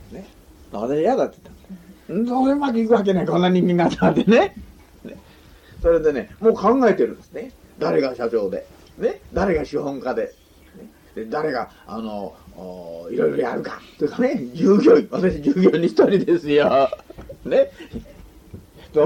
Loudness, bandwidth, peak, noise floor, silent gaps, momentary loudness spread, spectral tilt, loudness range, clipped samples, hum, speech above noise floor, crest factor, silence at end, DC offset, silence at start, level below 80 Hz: -20 LUFS; 15 kHz; -4 dBFS; -47 dBFS; none; 19 LU; -7.5 dB/octave; 9 LU; under 0.1%; none; 28 dB; 18 dB; 0 s; under 0.1%; 0 s; -44 dBFS